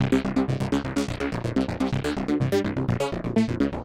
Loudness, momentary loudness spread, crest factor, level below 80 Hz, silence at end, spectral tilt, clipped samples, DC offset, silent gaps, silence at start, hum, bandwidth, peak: -26 LUFS; 4 LU; 16 dB; -42 dBFS; 0 s; -7 dB/octave; under 0.1%; under 0.1%; none; 0 s; none; 15 kHz; -10 dBFS